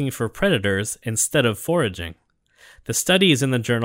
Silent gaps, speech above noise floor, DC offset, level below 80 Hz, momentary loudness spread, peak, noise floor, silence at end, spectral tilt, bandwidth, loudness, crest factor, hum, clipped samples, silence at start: none; 33 dB; under 0.1%; -48 dBFS; 10 LU; -4 dBFS; -53 dBFS; 0 s; -4 dB/octave; 16.5 kHz; -20 LUFS; 18 dB; none; under 0.1%; 0 s